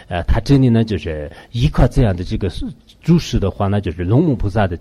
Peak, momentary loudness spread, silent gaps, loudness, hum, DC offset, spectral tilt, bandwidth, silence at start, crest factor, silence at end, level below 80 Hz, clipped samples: -2 dBFS; 12 LU; none; -17 LUFS; none; under 0.1%; -7.5 dB/octave; 12 kHz; 0.1 s; 14 dB; 0 s; -24 dBFS; under 0.1%